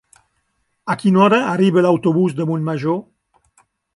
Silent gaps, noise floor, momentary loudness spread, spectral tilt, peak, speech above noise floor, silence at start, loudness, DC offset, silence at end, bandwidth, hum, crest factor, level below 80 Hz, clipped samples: none; -68 dBFS; 11 LU; -7.5 dB/octave; -2 dBFS; 53 dB; 0.85 s; -16 LUFS; under 0.1%; 0.95 s; 11.5 kHz; none; 16 dB; -64 dBFS; under 0.1%